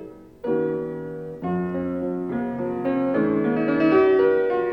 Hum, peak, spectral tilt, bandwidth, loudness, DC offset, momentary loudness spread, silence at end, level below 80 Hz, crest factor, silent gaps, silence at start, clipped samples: none; -6 dBFS; -9.5 dB/octave; 5.4 kHz; -23 LUFS; under 0.1%; 14 LU; 0 s; -56 dBFS; 16 dB; none; 0 s; under 0.1%